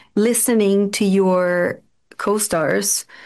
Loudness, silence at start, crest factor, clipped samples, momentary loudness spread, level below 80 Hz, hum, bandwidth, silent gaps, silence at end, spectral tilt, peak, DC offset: -18 LUFS; 0.15 s; 10 dB; under 0.1%; 7 LU; -60 dBFS; none; 13 kHz; none; 0 s; -4 dB/octave; -8 dBFS; under 0.1%